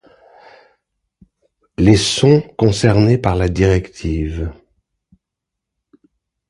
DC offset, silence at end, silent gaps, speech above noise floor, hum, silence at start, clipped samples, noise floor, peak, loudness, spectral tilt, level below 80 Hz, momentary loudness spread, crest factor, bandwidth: under 0.1%; 2 s; none; 67 dB; none; 1.8 s; under 0.1%; -81 dBFS; 0 dBFS; -15 LUFS; -6 dB/octave; -32 dBFS; 11 LU; 18 dB; 11.5 kHz